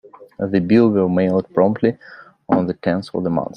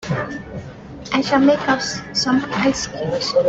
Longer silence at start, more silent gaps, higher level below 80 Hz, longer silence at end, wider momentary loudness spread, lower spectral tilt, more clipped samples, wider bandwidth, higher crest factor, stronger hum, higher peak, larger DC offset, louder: first, 0.2 s vs 0 s; neither; second, -56 dBFS vs -46 dBFS; about the same, 0 s vs 0 s; second, 8 LU vs 18 LU; first, -9.5 dB/octave vs -4.5 dB/octave; neither; first, 9 kHz vs 8 kHz; about the same, 16 dB vs 16 dB; neither; about the same, -2 dBFS vs -4 dBFS; neither; about the same, -18 LUFS vs -19 LUFS